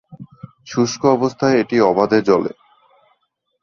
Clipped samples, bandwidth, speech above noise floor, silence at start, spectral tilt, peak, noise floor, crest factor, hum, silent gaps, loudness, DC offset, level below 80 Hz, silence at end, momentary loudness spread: under 0.1%; 7.2 kHz; 53 dB; 0.1 s; -5.5 dB/octave; -2 dBFS; -68 dBFS; 16 dB; none; none; -17 LUFS; under 0.1%; -58 dBFS; 1.15 s; 10 LU